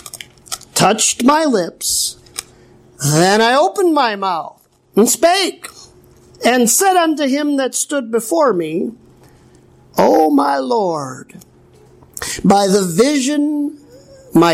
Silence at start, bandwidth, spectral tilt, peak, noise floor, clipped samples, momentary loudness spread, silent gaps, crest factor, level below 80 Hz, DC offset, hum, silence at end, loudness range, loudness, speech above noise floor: 0.05 s; 16.5 kHz; -3.5 dB/octave; 0 dBFS; -46 dBFS; under 0.1%; 16 LU; none; 14 dB; -54 dBFS; under 0.1%; none; 0 s; 3 LU; -14 LUFS; 32 dB